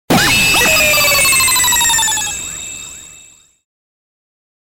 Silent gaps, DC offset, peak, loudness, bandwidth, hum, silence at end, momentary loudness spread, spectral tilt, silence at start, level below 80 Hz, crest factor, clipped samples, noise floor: none; under 0.1%; -4 dBFS; -9 LUFS; 17 kHz; none; 1.45 s; 16 LU; -1 dB/octave; 0.1 s; -38 dBFS; 12 dB; under 0.1%; -43 dBFS